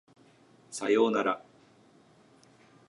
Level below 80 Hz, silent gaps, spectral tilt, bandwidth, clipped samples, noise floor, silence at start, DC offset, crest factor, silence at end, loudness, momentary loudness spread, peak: -84 dBFS; none; -4 dB/octave; 11.5 kHz; under 0.1%; -60 dBFS; 0.7 s; under 0.1%; 20 dB; 1.5 s; -28 LUFS; 13 LU; -12 dBFS